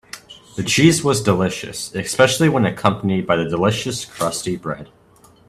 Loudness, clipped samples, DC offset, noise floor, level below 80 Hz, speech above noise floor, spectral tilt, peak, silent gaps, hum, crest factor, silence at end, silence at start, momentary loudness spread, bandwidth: -18 LUFS; under 0.1%; under 0.1%; -50 dBFS; -50 dBFS; 32 dB; -4.5 dB/octave; 0 dBFS; none; none; 18 dB; 0.65 s; 0.15 s; 13 LU; 15 kHz